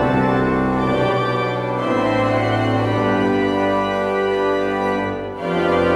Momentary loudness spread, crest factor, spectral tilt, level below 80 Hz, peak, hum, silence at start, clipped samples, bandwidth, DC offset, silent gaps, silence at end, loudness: 4 LU; 12 dB; -7 dB/octave; -42 dBFS; -6 dBFS; none; 0 s; under 0.1%; 12.5 kHz; under 0.1%; none; 0 s; -19 LUFS